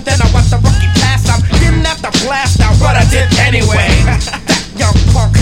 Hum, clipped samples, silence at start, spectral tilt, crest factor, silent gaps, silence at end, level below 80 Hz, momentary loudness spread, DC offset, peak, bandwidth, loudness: none; 0.2%; 0 s; -4.5 dB/octave; 8 dB; none; 0 s; -14 dBFS; 4 LU; under 0.1%; 0 dBFS; 15.5 kHz; -10 LUFS